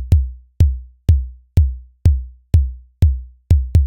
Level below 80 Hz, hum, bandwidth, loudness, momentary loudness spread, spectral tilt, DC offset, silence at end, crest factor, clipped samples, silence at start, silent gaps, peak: -18 dBFS; none; 6 kHz; -19 LUFS; 6 LU; -8.5 dB/octave; 0.2%; 0 s; 14 dB; under 0.1%; 0 s; none; -2 dBFS